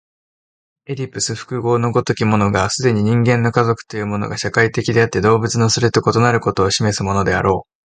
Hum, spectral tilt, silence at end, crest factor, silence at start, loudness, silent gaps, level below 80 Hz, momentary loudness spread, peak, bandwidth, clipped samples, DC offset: none; -5 dB/octave; 0.25 s; 16 dB; 0.9 s; -16 LUFS; none; -42 dBFS; 7 LU; 0 dBFS; 9.6 kHz; under 0.1%; under 0.1%